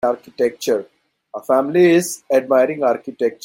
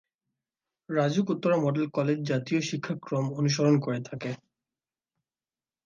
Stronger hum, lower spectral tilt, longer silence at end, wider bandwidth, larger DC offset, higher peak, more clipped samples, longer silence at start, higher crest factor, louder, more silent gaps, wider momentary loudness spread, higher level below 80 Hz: neither; second, -5 dB/octave vs -6.5 dB/octave; second, 0.1 s vs 1.5 s; first, 16.5 kHz vs 7.4 kHz; neither; first, -2 dBFS vs -12 dBFS; neither; second, 0.05 s vs 0.9 s; about the same, 14 dB vs 18 dB; first, -17 LUFS vs -28 LUFS; neither; about the same, 9 LU vs 10 LU; first, -66 dBFS vs -74 dBFS